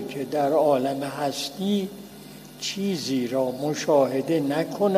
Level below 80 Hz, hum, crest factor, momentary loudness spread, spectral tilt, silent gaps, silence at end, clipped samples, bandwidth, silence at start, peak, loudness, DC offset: -64 dBFS; none; 18 dB; 12 LU; -5 dB/octave; none; 0 s; under 0.1%; 15.5 kHz; 0 s; -6 dBFS; -25 LUFS; under 0.1%